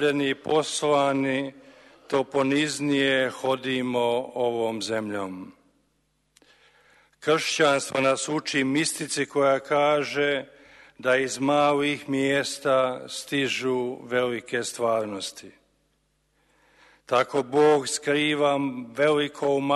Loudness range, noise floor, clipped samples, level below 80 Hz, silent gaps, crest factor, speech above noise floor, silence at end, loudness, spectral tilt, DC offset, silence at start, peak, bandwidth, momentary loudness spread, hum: 6 LU; -70 dBFS; under 0.1%; -68 dBFS; none; 18 dB; 46 dB; 0 s; -24 LUFS; -4 dB/octave; under 0.1%; 0 s; -8 dBFS; 12.5 kHz; 8 LU; none